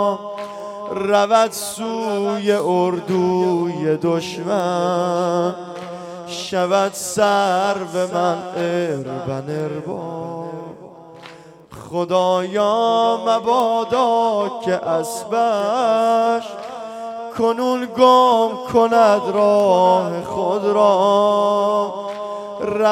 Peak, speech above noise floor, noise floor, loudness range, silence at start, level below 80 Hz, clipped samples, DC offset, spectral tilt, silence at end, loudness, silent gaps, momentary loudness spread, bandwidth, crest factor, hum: 0 dBFS; 23 dB; -41 dBFS; 8 LU; 0 s; -62 dBFS; under 0.1%; under 0.1%; -5 dB/octave; 0 s; -18 LUFS; none; 14 LU; 16 kHz; 18 dB; none